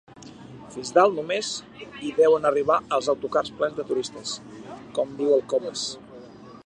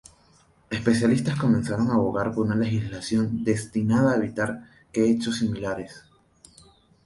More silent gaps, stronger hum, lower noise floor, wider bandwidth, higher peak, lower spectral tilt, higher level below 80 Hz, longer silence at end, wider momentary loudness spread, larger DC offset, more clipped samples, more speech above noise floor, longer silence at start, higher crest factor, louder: neither; neither; second, -44 dBFS vs -59 dBFS; second, 10 kHz vs 11.5 kHz; about the same, -4 dBFS vs -6 dBFS; second, -3.5 dB/octave vs -6.5 dB/octave; second, -62 dBFS vs -52 dBFS; second, 0.05 s vs 1.05 s; first, 21 LU vs 10 LU; neither; neither; second, 20 dB vs 36 dB; second, 0.15 s vs 0.7 s; about the same, 20 dB vs 18 dB; about the same, -24 LUFS vs -24 LUFS